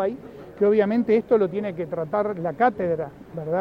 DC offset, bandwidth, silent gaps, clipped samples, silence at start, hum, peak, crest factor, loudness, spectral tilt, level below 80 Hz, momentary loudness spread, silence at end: under 0.1%; 5.4 kHz; none; under 0.1%; 0 s; none; -6 dBFS; 16 dB; -23 LUFS; -9 dB/octave; -58 dBFS; 13 LU; 0 s